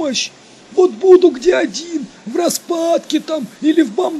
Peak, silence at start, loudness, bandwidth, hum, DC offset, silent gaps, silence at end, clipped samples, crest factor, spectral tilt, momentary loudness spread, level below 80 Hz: 0 dBFS; 0 s; -15 LUFS; 13.5 kHz; none; under 0.1%; none; 0 s; 0.2%; 14 dB; -3.5 dB/octave; 14 LU; -56 dBFS